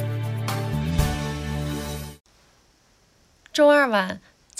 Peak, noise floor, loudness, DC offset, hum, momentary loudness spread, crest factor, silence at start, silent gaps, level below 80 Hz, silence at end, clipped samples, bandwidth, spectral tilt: -6 dBFS; -60 dBFS; -23 LUFS; under 0.1%; none; 16 LU; 18 dB; 0 s; 2.20-2.24 s; -38 dBFS; 0.4 s; under 0.1%; 16 kHz; -5.5 dB/octave